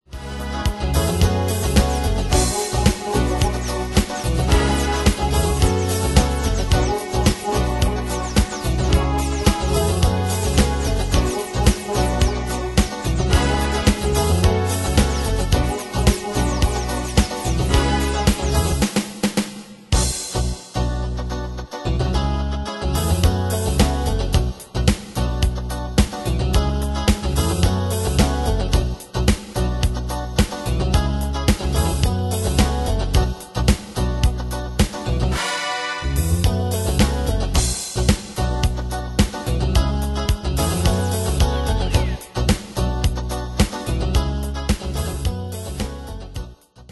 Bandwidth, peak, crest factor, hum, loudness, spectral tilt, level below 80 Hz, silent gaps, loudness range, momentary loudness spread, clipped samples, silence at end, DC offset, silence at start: 12.5 kHz; 0 dBFS; 20 dB; none; -21 LUFS; -5 dB/octave; -24 dBFS; none; 3 LU; 6 LU; under 0.1%; 0.1 s; under 0.1%; 0.1 s